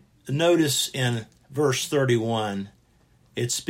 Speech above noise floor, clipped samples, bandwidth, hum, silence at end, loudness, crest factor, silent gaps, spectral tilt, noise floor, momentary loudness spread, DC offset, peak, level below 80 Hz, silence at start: 37 dB; under 0.1%; 16.5 kHz; none; 0.05 s; -24 LUFS; 16 dB; none; -4.5 dB/octave; -60 dBFS; 14 LU; under 0.1%; -8 dBFS; -64 dBFS; 0.25 s